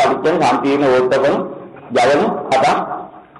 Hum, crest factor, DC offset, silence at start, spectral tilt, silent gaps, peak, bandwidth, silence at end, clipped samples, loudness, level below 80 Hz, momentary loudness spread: none; 8 dB; under 0.1%; 0 s; -5 dB/octave; none; -6 dBFS; 11.5 kHz; 0 s; under 0.1%; -15 LUFS; -54 dBFS; 13 LU